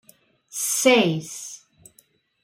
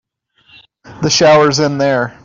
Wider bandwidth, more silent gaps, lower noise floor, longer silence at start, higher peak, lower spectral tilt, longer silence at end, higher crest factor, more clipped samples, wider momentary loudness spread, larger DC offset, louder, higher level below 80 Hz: first, 16.5 kHz vs 7.6 kHz; neither; first, -61 dBFS vs -53 dBFS; second, 0.55 s vs 0.9 s; about the same, -2 dBFS vs -2 dBFS; about the same, -3 dB/octave vs -4 dB/octave; first, 0.9 s vs 0.15 s; first, 22 dB vs 12 dB; neither; first, 20 LU vs 7 LU; neither; second, -20 LUFS vs -11 LUFS; second, -72 dBFS vs -50 dBFS